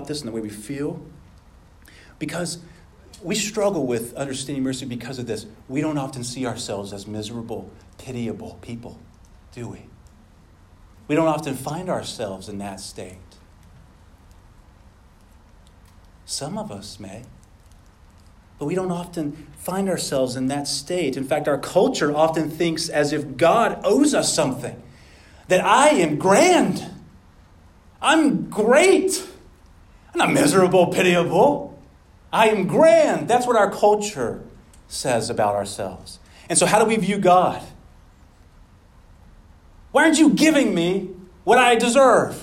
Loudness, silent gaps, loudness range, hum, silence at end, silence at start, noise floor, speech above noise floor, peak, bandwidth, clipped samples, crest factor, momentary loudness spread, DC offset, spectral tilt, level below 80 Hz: -20 LUFS; none; 17 LU; none; 0 s; 0 s; -50 dBFS; 30 dB; -4 dBFS; 16 kHz; under 0.1%; 18 dB; 19 LU; under 0.1%; -4 dB/octave; -52 dBFS